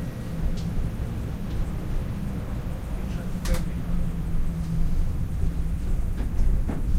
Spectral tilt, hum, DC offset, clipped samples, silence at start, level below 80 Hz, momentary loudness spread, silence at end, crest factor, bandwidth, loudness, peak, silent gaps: -7 dB/octave; none; under 0.1%; under 0.1%; 0 s; -26 dBFS; 4 LU; 0 s; 14 dB; 15 kHz; -30 LUFS; -10 dBFS; none